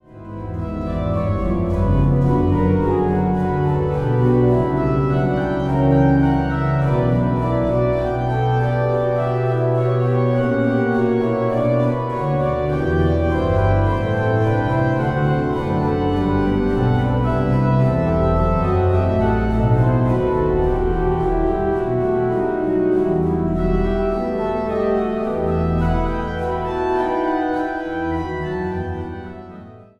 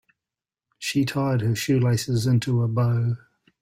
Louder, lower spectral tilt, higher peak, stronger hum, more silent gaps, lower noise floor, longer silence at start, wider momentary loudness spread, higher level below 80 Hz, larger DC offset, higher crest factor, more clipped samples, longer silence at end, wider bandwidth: first, -19 LUFS vs -23 LUFS; first, -9.5 dB/octave vs -6 dB/octave; first, -4 dBFS vs -10 dBFS; neither; neither; second, -39 dBFS vs -89 dBFS; second, 0.1 s vs 0.8 s; about the same, 6 LU vs 6 LU; first, -30 dBFS vs -56 dBFS; neither; about the same, 14 dB vs 14 dB; neither; second, 0.15 s vs 0.45 s; second, 6.6 kHz vs 16 kHz